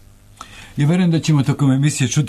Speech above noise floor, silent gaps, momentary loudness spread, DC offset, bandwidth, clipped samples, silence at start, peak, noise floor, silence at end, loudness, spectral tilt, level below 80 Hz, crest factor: 26 dB; none; 10 LU; under 0.1%; 13.5 kHz; under 0.1%; 0.4 s; -6 dBFS; -41 dBFS; 0 s; -16 LUFS; -6 dB/octave; -48 dBFS; 12 dB